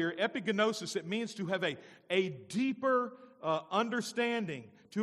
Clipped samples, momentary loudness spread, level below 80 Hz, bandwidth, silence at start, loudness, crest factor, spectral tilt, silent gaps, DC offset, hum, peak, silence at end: under 0.1%; 10 LU; -84 dBFS; 14 kHz; 0 s; -34 LUFS; 18 dB; -4.5 dB/octave; none; under 0.1%; none; -16 dBFS; 0 s